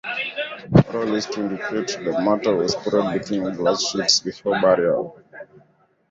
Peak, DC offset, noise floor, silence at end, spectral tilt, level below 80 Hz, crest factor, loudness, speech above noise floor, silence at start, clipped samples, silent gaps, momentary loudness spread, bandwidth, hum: -2 dBFS; under 0.1%; -59 dBFS; 0.65 s; -4.5 dB/octave; -50 dBFS; 20 dB; -21 LUFS; 37 dB; 0.05 s; under 0.1%; none; 8 LU; 7.8 kHz; none